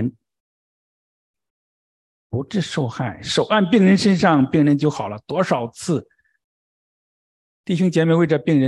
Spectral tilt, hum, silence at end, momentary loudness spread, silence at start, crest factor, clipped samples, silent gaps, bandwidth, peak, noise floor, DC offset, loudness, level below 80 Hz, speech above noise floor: -6.5 dB/octave; none; 0 s; 12 LU; 0 s; 18 dB; under 0.1%; 0.40-1.34 s, 1.50-2.30 s, 6.44-7.64 s; 11.5 kHz; -2 dBFS; under -90 dBFS; under 0.1%; -19 LUFS; -54 dBFS; over 72 dB